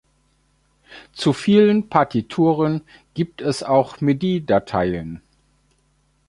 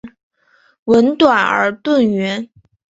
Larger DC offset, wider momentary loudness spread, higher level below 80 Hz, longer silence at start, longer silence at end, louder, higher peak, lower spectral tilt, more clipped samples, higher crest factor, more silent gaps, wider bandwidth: neither; about the same, 14 LU vs 14 LU; first, -50 dBFS vs -56 dBFS; first, 0.9 s vs 0.05 s; first, 1.1 s vs 0.45 s; second, -19 LUFS vs -14 LUFS; about the same, 0 dBFS vs 0 dBFS; first, -7 dB/octave vs -5.5 dB/octave; neither; about the same, 20 dB vs 16 dB; second, none vs 0.23-0.31 s, 0.79-0.86 s; first, 11.5 kHz vs 7.8 kHz